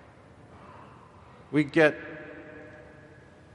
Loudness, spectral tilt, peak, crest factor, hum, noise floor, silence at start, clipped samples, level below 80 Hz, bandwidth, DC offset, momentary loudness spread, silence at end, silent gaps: -25 LUFS; -6.5 dB/octave; -8 dBFS; 24 dB; none; -52 dBFS; 1.5 s; under 0.1%; -64 dBFS; 11 kHz; under 0.1%; 27 LU; 0.9 s; none